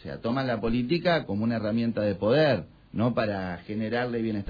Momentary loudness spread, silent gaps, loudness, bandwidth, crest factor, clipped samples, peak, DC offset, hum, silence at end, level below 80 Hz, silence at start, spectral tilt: 8 LU; none; -27 LUFS; 5 kHz; 16 dB; under 0.1%; -12 dBFS; under 0.1%; none; 0 s; -50 dBFS; 0.05 s; -8.5 dB/octave